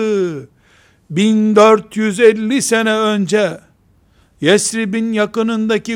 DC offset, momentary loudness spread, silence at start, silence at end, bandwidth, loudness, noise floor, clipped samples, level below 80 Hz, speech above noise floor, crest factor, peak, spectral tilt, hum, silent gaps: under 0.1%; 9 LU; 0 s; 0 s; 15.5 kHz; -14 LUFS; -53 dBFS; under 0.1%; -58 dBFS; 39 dB; 14 dB; 0 dBFS; -4.5 dB/octave; none; none